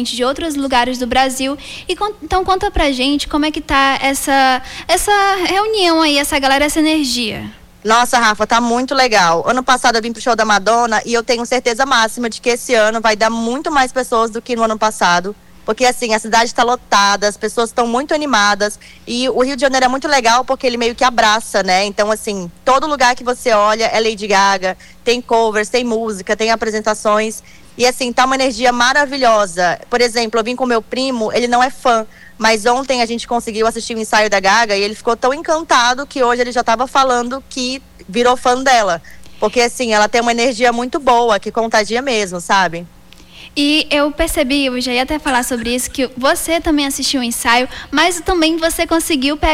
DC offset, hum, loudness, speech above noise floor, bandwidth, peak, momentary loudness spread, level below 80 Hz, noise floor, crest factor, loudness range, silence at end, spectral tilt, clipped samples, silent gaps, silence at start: under 0.1%; none; -14 LUFS; 25 dB; 18 kHz; -2 dBFS; 7 LU; -38 dBFS; -39 dBFS; 12 dB; 2 LU; 0 s; -2.5 dB/octave; under 0.1%; none; 0 s